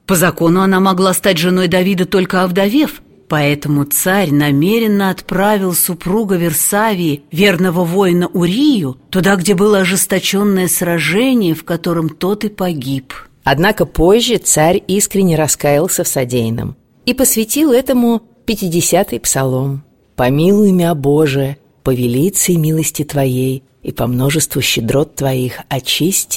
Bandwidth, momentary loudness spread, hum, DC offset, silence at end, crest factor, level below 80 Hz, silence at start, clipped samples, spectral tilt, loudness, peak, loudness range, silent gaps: 17 kHz; 8 LU; none; 0.3%; 0 s; 14 dB; -38 dBFS; 0.1 s; under 0.1%; -4.5 dB/octave; -13 LUFS; 0 dBFS; 2 LU; none